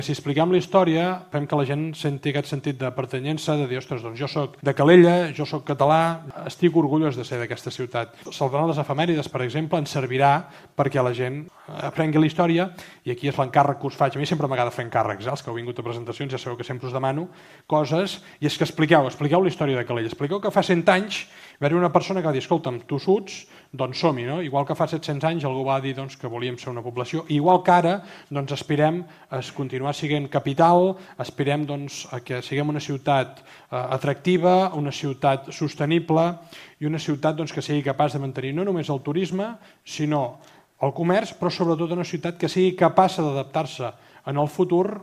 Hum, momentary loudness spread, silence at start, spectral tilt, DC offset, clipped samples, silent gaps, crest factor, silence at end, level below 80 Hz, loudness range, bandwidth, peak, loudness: none; 12 LU; 0 s; -6.5 dB/octave; under 0.1%; under 0.1%; none; 22 dB; 0 s; -64 dBFS; 5 LU; 14.5 kHz; 0 dBFS; -23 LUFS